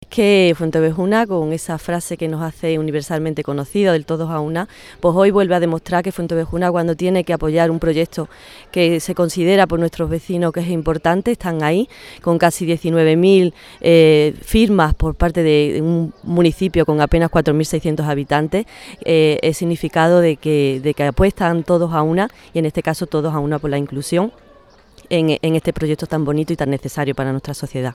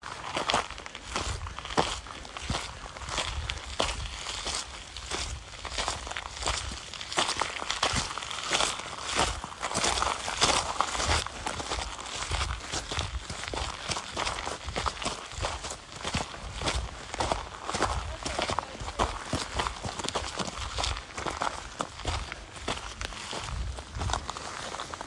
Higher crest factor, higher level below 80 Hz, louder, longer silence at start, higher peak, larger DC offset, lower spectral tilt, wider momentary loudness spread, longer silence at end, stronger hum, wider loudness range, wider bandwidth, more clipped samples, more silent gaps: second, 16 dB vs 28 dB; first, -34 dBFS vs -42 dBFS; first, -17 LUFS vs -32 LUFS; about the same, 0.1 s vs 0 s; first, 0 dBFS vs -6 dBFS; neither; first, -6.5 dB/octave vs -2.5 dB/octave; about the same, 9 LU vs 10 LU; about the same, 0 s vs 0 s; neither; about the same, 6 LU vs 6 LU; first, 15.5 kHz vs 11.5 kHz; neither; neither